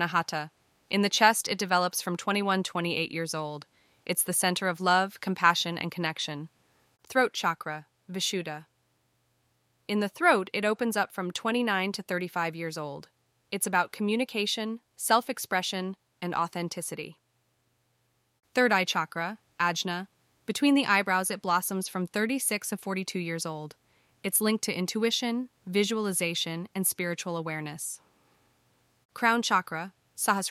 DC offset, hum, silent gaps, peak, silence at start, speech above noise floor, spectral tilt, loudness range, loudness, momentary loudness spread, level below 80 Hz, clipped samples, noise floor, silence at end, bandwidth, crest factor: under 0.1%; none; 29.05-29.09 s; -6 dBFS; 0 s; 44 dB; -3 dB/octave; 4 LU; -28 LUFS; 14 LU; -78 dBFS; under 0.1%; -73 dBFS; 0 s; 16 kHz; 24 dB